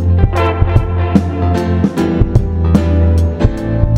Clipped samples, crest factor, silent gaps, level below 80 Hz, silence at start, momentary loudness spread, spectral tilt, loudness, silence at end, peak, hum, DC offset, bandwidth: 0.6%; 12 dB; none; -18 dBFS; 0 s; 3 LU; -8.5 dB/octave; -13 LUFS; 0 s; 0 dBFS; none; under 0.1%; 8 kHz